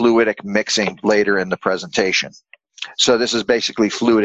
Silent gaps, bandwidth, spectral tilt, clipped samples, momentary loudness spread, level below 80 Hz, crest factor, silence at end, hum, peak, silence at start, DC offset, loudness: none; 8.2 kHz; -3 dB/octave; under 0.1%; 6 LU; -54 dBFS; 18 dB; 0 s; none; 0 dBFS; 0 s; under 0.1%; -17 LUFS